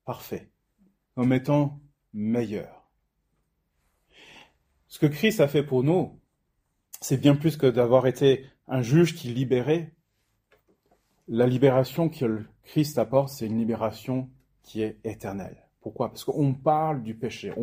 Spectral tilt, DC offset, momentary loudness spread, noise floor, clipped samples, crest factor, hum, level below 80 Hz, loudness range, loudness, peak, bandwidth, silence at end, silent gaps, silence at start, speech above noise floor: -7 dB/octave; under 0.1%; 15 LU; -75 dBFS; under 0.1%; 22 dB; none; -62 dBFS; 7 LU; -25 LUFS; -4 dBFS; 16 kHz; 0 s; none; 0.05 s; 50 dB